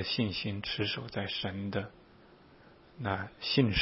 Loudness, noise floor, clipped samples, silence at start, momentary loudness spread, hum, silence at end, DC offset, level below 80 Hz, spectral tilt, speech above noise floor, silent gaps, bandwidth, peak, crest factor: -34 LUFS; -58 dBFS; under 0.1%; 0 s; 8 LU; none; 0 s; under 0.1%; -54 dBFS; -4 dB/octave; 25 dB; none; 5.8 kHz; -14 dBFS; 22 dB